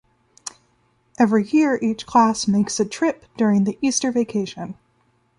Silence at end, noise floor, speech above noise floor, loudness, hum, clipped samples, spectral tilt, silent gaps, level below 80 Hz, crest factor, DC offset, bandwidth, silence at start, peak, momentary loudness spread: 0.65 s; -63 dBFS; 44 dB; -20 LUFS; none; under 0.1%; -5 dB/octave; none; -60 dBFS; 18 dB; under 0.1%; 11.5 kHz; 0.45 s; -4 dBFS; 18 LU